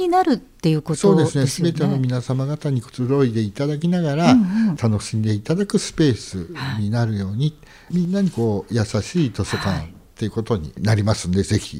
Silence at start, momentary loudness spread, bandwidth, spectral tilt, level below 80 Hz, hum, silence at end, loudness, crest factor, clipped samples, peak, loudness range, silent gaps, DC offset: 0 s; 8 LU; 15 kHz; -6.5 dB/octave; -46 dBFS; none; 0 s; -20 LUFS; 20 dB; under 0.1%; 0 dBFS; 3 LU; none; under 0.1%